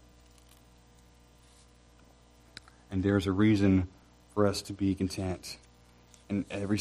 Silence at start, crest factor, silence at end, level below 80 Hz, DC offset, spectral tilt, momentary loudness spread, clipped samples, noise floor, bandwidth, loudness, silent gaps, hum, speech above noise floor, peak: 2.9 s; 20 dB; 0 s; -56 dBFS; under 0.1%; -6.5 dB/octave; 23 LU; under 0.1%; -59 dBFS; 14 kHz; -30 LUFS; none; 60 Hz at -60 dBFS; 31 dB; -12 dBFS